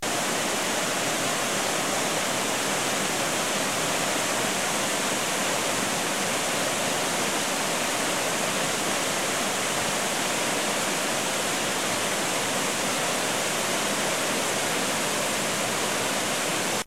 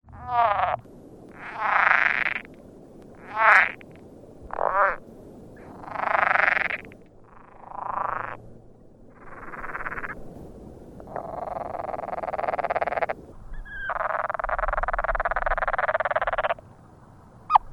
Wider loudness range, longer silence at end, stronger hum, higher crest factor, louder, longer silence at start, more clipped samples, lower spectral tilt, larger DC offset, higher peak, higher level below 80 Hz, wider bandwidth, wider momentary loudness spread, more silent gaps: second, 0 LU vs 13 LU; about the same, 0 s vs 0 s; neither; second, 14 dB vs 26 dB; about the same, -25 LUFS vs -25 LUFS; about the same, 0 s vs 0.05 s; neither; second, -1.5 dB/octave vs -5 dB/octave; first, 0.4% vs under 0.1%; second, -12 dBFS vs -2 dBFS; second, -62 dBFS vs -42 dBFS; first, 16 kHz vs 12.5 kHz; second, 0 LU vs 24 LU; neither